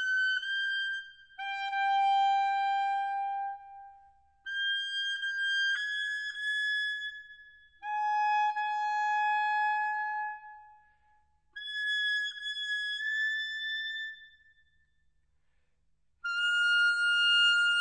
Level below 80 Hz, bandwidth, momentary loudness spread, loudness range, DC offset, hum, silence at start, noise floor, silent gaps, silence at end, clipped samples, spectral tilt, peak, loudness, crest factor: -76 dBFS; 9 kHz; 15 LU; 4 LU; under 0.1%; 50 Hz at -90 dBFS; 0 s; -76 dBFS; none; 0 s; under 0.1%; 4.5 dB/octave; -16 dBFS; -29 LUFS; 16 dB